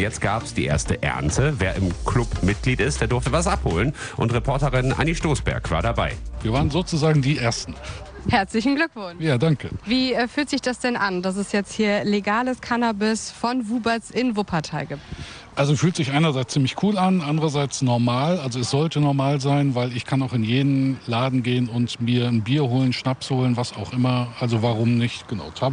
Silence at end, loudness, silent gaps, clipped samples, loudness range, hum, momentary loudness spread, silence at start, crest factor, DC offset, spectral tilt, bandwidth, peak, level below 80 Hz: 0 s; -22 LUFS; none; under 0.1%; 2 LU; none; 5 LU; 0 s; 16 dB; under 0.1%; -5.5 dB/octave; 10 kHz; -6 dBFS; -36 dBFS